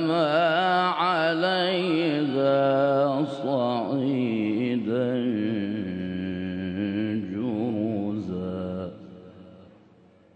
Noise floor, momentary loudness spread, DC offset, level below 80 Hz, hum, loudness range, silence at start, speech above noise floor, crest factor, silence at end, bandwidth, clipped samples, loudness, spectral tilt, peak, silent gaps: -56 dBFS; 9 LU; under 0.1%; -68 dBFS; none; 7 LU; 0 s; 32 dB; 14 dB; 0.7 s; 9 kHz; under 0.1%; -25 LUFS; -7.5 dB/octave; -12 dBFS; none